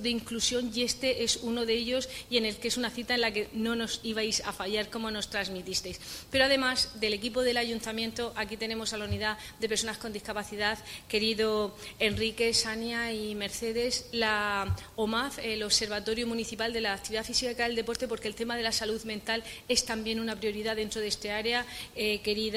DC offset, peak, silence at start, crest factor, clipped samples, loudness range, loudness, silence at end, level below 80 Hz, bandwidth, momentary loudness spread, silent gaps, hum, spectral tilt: under 0.1%; -10 dBFS; 0 s; 20 dB; under 0.1%; 2 LU; -30 LUFS; 0 s; -54 dBFS; 16 kHz; 7 LU; none; none; -2.5 dB/octave